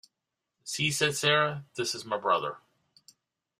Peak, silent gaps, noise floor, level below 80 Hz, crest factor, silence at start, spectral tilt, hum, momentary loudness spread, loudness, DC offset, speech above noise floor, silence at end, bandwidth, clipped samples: -10 dBFS; none; -86 dBFS; -70 dBFS; 22 dB; 0.65 s; -3 dB/octave; none; 14 LU; -28 LUFS; under 0.1%; 57 dB; 1 s; 15.5 kHz; under 0.1%